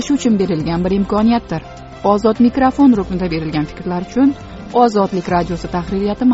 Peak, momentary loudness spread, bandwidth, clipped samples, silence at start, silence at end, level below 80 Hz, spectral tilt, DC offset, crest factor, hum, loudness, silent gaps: 0 dBFS; 9 LU; 8 kHz; under 0.1%; 0 s; 0 s; -36 dBFS; -6.5 dB/octave; under 0.1%; 14 dB; none; -16 LUFS; none